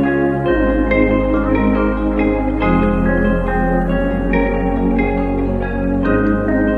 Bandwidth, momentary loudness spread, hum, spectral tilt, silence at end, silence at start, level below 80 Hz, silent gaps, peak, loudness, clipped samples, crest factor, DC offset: 4.6 kHz; 3 LU; none; -9.5 dB/octave; 0 s; 0 s; -22 dBFS; none; -2 dBFS; -16 LUFS; under 0.1%; 14 dB; under 0.1%